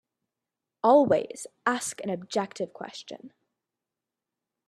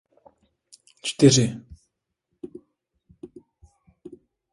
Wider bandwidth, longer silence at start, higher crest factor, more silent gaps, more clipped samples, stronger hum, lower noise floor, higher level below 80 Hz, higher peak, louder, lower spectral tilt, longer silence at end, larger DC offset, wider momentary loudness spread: first, 13 kHz vs 11.5 kHz; second, 0.85 s vs 1.05 s; about the same, 22 dB vs 26 dB; neither; neither; neither; first, -88 dBFS vs -78 dBFS; second, -74 dBFS vs -58 dBFS; second, -8 dBFS vs -2 dBFS; second, -26 LUFS vs -20 LUFS; about the same, -4.5 dB/octave vs -5 dB/octave; first, 1.4 s vs 1.25 s; neither; second, 20 LU vs 29 LU